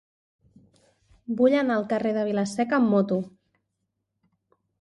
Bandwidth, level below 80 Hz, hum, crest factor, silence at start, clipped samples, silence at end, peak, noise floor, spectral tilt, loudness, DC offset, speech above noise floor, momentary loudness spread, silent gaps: 11.5 kHz; -68 dBFS; none; 18 dB; 1.3 s; under 0.1%; 1.55 s; -8 dBFS; -79 dBFS; -6.5 dB/octave; -24 LUFS; under 0.1%; 56 dB; 11 LU; none